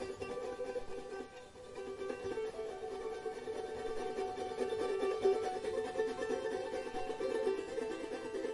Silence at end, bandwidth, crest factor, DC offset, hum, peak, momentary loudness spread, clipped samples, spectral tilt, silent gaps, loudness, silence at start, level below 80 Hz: 0 s; 11.5 kHz; 18 dB; under 0.1%; none; -20 dBFS; 9 LU; under 0.1%; -4.5 dB/octave; none; -40 LUFS; 0 s; -64 dBFS